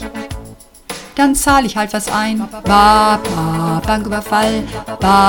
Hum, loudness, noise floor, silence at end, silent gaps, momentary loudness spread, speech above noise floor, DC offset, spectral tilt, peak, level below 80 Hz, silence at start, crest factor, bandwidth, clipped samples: none; -14 LUFS; -37 dBFS; 0 s; none; 17 LU; 23 dB; under 0.1%; -4.5 dB/octave; 0 dBFS; -32 dBFS; 0 s; 14 dB; 19.5 kHz; 0.1%